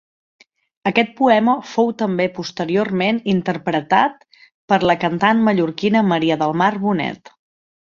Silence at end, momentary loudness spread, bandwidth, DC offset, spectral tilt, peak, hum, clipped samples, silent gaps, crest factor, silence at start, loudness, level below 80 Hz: 0.8 s; 7 LU; 7.2 kHz; under 0.1%; -6.5 dB/octave; 0 dBFS; none; under 0.1%; 4.54-4.68 s; 18 dB; 0.85 s; -18 LUFS; -58 dBFS